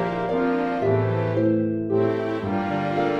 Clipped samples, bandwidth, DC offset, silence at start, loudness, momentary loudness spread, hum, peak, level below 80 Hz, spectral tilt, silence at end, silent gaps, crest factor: under 0.1%; 7 kHz; under 0.1%; 0 s; -23 LUFS; 4 LU; none; -8 dBFS; -54 dBFS; -9 dB/octave; 0 s; none; 14 dB